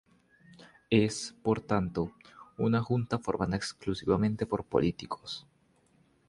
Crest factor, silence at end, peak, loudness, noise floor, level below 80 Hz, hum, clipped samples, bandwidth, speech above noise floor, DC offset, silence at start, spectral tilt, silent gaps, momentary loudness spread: 22 dB; 0.9 s; -10 dBFS; -31 LUFS; -67 dBFS; -54 dBFS; none; under 0.1%; 11.5 kHz; 37 dB; under 0.1%; 0.6 s; -6 dB/octave; none; 11 LU